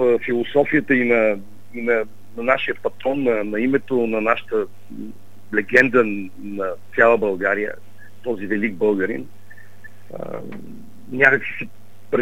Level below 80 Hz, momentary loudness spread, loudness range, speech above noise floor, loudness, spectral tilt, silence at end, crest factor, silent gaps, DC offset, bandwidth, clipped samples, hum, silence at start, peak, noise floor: -64 dBFS; 19 LU; 5 LU; 26 dB; -20 LUFS; -6.5 dB/octave; 0 s; 22 dB; none; 2%; 16 kHz; under 0.1%; none; 0 s; 0 dBFS; -46 dBFS